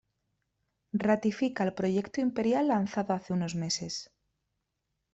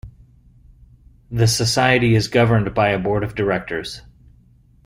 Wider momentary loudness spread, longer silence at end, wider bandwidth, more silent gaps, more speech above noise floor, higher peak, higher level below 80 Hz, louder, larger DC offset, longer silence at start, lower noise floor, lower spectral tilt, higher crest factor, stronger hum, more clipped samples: second, 5 LU vs 12 LU; first, 1.1 s vs 0.85 s; second, 8.2 kHz vs 16 kHz; neither; first, 53 dB vs 34 dB; second, -14 dBFS vs -2 dBFS; second, -68 dBFS vs -42 dBFS; second, -30 LUFS vs -18 LUFS; neither; first, 0.95 s vs 0.05 s; first, -83 dBFS vs -52 dBFS; about the same, -5.5 dB/octave vs -5 dB/octave; about the same, 18 dB vs 18 dB; neither; neither